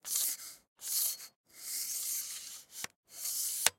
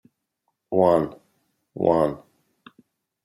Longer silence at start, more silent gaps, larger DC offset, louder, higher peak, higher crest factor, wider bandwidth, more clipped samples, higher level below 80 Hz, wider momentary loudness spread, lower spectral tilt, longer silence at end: second, 0.05 s vs 0.7 s; first, 0.68-0.76 s, 1.36-1.44 s, 2.96-3.03 s vs none; neither; second, -35 LUFS vs -22 LUFS; about the same, -6 dBFS vs -4 dBFS; first, 32 dB vs 22 dB; about the same, 16.5 kHz vs 15.5 kHz; neither; second, -80 dBFS vs -60 dBFS; second, 13 LU vs 18 LU; second, 2.5 dB/octave vs -8.5 dB/octave; second, 0.05 s vs 1.05 s